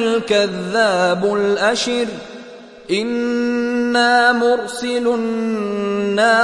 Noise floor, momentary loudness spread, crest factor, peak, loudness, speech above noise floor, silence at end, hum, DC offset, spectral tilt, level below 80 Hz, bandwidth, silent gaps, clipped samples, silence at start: -37 dBFS; 8 LU; 16 dB; -2 dBFS; -17 LUFS; 21 dB; 0 s; none; under 0.1%; -4 dB/octave; -58 dBFS; 11.5 kHz; none; under 0.1%; 0 s